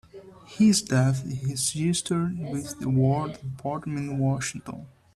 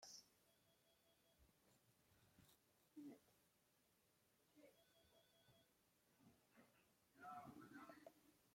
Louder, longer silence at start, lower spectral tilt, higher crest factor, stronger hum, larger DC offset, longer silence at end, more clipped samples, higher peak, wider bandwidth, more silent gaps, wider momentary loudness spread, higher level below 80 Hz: first, -26 LUFS vs -63 LUFS; first, 0.15 s vs 0 s; first, -5 dB/octave vs -3.5 dB/octave; second, 16 dB vs 22 dB; neither; neither; first, 0.25 s vs 0 s; neither; first, -10 dBFS vs -46 dBFS; second, 13.5 kHz vs 16.5 kHz; neither; first, 13 LU vs 8 LU; first, -56 dBFS vs under -90 dBFS